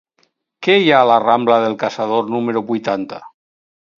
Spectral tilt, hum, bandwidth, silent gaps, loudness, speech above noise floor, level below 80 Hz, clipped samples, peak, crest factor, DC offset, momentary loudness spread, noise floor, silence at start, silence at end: -6 dB/octave; none; 7.4 kHz; none; -15 LUFS; 48 dB; -66 dBFS; under 0.1%; 0 dBFS; 16 dB; under 0.1%; 11 LU; -63 dBFS; 0.6 s; 0.7 s